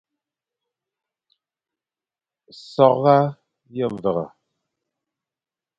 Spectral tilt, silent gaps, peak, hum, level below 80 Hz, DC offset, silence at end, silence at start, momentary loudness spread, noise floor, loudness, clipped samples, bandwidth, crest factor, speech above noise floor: -8.5 dB/octave; none; 0 dBFS; none; -66 dBFS; under 0.1%; 1.5 s; 2.7 s; 17 LU; under -90 dBFS; -19 LUFS; under 0.1%; 7.6 kHz; 24 dB; over 71 dB